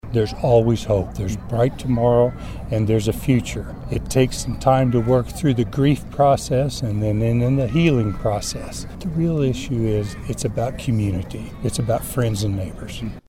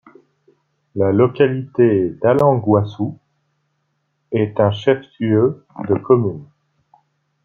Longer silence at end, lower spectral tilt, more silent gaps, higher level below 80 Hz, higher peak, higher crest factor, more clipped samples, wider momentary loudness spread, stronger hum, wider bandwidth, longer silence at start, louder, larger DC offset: second, 0.1 s vs 1 s; second, -6.5 dB/octave vs -9.5 dB/octave; neither; first, -36 dBFS vs -58 dBFS; about the same, -4 dBFS vs -2 dBFS; about the same, 16 dB vs 16 dB; neither; about the same, 11 LU vs 11 LU; neither; first, 16 kHz vs 6.8 kHz; second, 0.05 s vs 0.95 s; second, -21 LUFS vs -17 LUFS; neither